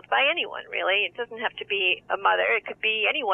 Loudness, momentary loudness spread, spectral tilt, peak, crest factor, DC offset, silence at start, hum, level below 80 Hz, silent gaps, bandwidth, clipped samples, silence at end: -24 LUFS; 8 LU; -4.5 dB/octave; -8 dBFS; 16 dB; under 0.1%; 0.1 s; none; -70 dBFS; none; 3.8 kHz; under 0.1%; 0 s